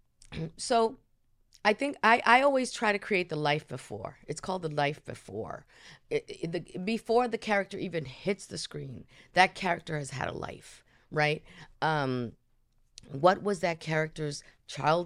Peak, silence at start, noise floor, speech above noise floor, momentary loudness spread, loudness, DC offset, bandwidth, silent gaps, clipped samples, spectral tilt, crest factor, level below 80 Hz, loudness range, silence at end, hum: -8 dBFS; 0.3 s; -67 dBFS; 37 dB; 16 LU; -30 LUFS; under 0.1%; 13.5 kHz; none; under 0.1%; -4.5 dB/octave; 24 dB; -60 dBFS; 7 LU; 0 s; none